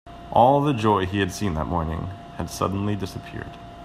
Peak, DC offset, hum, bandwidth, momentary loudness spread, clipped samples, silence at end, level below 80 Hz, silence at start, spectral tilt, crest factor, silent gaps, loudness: -2 dBFS; under 0.1%; none; 15.5 kHz; 17 LU; under 0.1%; 0 s; -44 dBFS; 0.05 s; -6.5 dB/octave; 22 dB; none; -23 LUFS